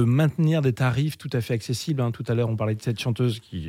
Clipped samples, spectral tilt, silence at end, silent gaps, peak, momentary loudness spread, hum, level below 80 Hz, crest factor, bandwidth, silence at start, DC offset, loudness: under 0.1%; -7 dB/octave; 0 s; none; -10 dBFS; 6 LU; none; -58 dBFS; 14 dB; 15.5 kHz; 0 s; under 0.1%; -25 LUFS